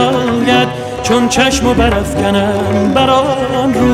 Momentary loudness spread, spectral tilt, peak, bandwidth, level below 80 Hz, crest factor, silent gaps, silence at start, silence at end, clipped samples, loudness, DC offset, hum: 4 LU; -5 dB/octave; -2 dBFS; 15.5 kHz; -28 dBFS; 10 dB; none; 0 s; 0 s; under 0.1%; -12 LUFS; under 0.1%; none